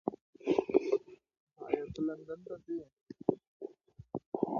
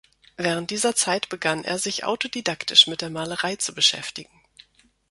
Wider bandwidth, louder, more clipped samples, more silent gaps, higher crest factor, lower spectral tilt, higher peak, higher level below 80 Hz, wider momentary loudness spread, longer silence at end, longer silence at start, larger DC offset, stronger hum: second, 7 kHz vs 12 kHz; second, -36 LUFS vs -22 LUFS; neither; first, 0.21-0.33 s, 1.40-1.47 s, 2.93-3.06 s, 3.47-3.60 s, 4.26-4.32 s vs none; about the same, 26 dB vs 24 dB; first, -8 dB/octave vs -1.5 dB/octave; second, -10 dBFS vs 0 dBFS; about the same, -68 dBFS vs -64 dBFS; first, 19 LU vs 13 LU; second, 0 s vs 0.85 s; second, 0.05 s vs 0.4 s; neither; neither